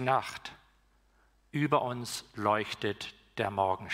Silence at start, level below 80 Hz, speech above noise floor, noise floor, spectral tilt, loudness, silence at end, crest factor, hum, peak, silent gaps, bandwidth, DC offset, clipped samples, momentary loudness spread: 0 s; -66 dBFS; 35 dB; -67 dBFS; -5 dB/octave; -32 LUFS; 0 s; 20 dB; 60 Hz at -65 dBFS; -12 dBFS; none; 16 kHz; under 0.1%; under 0.1%; 12 LU